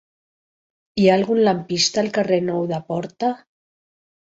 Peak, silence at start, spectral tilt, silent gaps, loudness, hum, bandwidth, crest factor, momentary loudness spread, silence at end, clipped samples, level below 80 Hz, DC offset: -2 dBFS; 0.95 s; -4.5 dB/octave; none; -20 LUFS; none; 8 kHz; 20 dB; 10 LU; 0.9 s; under 0.1%; -62 dBFS; under 0.1%